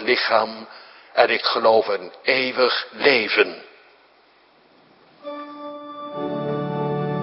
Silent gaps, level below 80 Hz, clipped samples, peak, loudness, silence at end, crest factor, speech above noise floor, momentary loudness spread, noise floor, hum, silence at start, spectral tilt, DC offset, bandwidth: none; -68 dBFS; under 0.1%; -2 dBFS; -20 LUFS; 0 s; 22 dB; 36 dB; 18 LU; -56 dBFS; none; 0 s; -9 dB/octave; under 0.1%; 5.8 kHz